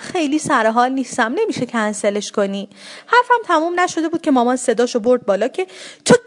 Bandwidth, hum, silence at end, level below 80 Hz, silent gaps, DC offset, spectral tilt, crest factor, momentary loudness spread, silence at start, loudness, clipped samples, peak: 11 kHz; none; 0.05 s; -64 dBFS; none; under 0.1%; -4 dB/octave; 18 dB; 8 LU; 0 s; -17 LUFS; under 0.1%; 0 dBFS